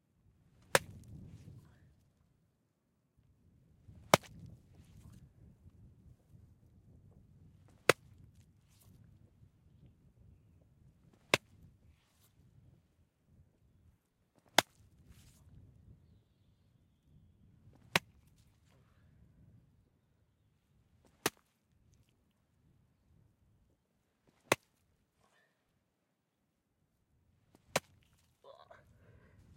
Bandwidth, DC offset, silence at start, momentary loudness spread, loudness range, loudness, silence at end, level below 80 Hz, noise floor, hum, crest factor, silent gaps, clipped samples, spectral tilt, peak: 16 kHz; under 0.1%; 0.75 s; 28 LU; 8 LU; -34 LUFS; 1.75 s; -72 dBFS; -82 dBFS; none; 40 dB; none; under 0.1%; -2.5 dB/octave; -6 dBFS